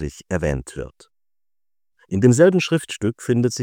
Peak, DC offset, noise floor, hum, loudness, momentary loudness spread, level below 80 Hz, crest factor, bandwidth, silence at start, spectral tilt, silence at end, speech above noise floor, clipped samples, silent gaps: -2 dBFS; under 0.1%; under -90 dBFS; none; -19 LUFS; 18 LU; -42 dBFS; 20 dB; 16.5 kHz; 0 s; -6 dB/octave; 0 s; over 71 dB; under 0.1%; none